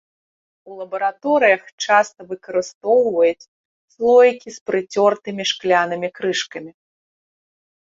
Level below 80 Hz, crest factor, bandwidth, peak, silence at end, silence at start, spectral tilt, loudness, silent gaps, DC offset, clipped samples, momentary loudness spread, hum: -68 dBFS; 18 dB; 7.8 kHz; -2 dBFS; 1.25 s; 0.65 s; -3.5 dB/octave; -18 LUFS; 1.72-1.78 s, 2.74-2.81 s, 3.48-3.88 s, 4.61-4.66 s; under 0.1%; under 0.1%; 15 LU; none